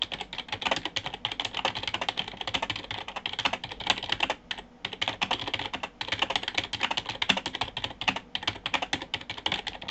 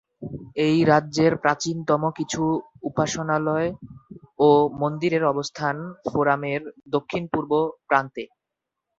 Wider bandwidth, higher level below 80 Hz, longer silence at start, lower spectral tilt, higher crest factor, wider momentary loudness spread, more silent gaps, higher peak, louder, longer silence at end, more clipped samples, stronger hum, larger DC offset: first, 14 kHz vs 8 kHz; about the same, -56 dBFS vs -58 dBFS; second, 0 s vs 0.2 s; second, -2 dB/octave vs -5.5 dB/octave; first, 26 dB vs 20 dB; second, 7 LU vs 12 LU; neither; second, -6 dBFS vs -2 dBFS; second, -30 LUFS vs -23 LUFS; second, 0 s vs 0.75 s; neither; neither; neither